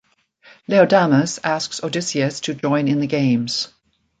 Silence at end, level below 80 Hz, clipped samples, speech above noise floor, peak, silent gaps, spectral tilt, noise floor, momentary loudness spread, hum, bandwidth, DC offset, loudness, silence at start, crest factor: 0.55 s; -62 dBFS; under 0.1%; 34 dB; -2 dBFS; none; -5 dB/octave; -52 dBFS; 10 LU; none; 9.4 kHz; under 0.1%; -19 LUFS; 0.7 s; 18 dB